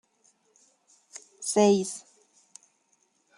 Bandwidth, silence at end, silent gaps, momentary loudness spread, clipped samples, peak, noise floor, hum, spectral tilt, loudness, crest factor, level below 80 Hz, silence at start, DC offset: 12.5 kHz; 1.4 s; none; 25 LU; under 0.1%; -8 dBFS; -70 dBFS; none; -4.5 dB/octave; -25 LUFS; 22 dB; -80 dBFS; 1.4 s; under 0.1%